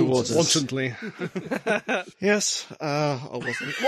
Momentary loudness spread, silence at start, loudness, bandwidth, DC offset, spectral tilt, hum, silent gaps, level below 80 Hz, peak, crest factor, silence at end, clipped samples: 9 LU; 0 s; -25 LUFS; 14 kHz; under 0.1%; -3.5 dB/octave; none; none; -64 dBFS; -8 dBFS; 18 dB; 0 s; under 0.1%